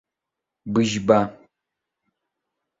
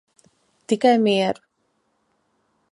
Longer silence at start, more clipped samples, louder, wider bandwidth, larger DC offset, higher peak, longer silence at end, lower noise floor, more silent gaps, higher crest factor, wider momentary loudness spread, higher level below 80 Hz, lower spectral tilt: about the same, 0.65 s vs 0.7 s; neither; about the same, -21 LUFS vs -19 LUFS; second, 7.8 kHz vs 11.5 kHz; neither; about the same, -2 dBFS vs -4 dBFS; about the same, 1.45 s vs 1.4 s; first, -85 dBFS vs -70 dBFS; neither; about the same, 24 dB vs 20 dB; about the same, 12 LU vs 10 LU; first, -58 dBFS vs -72 dBFS; about the same, -5.5 dB/octave vs -5.5 dB/octave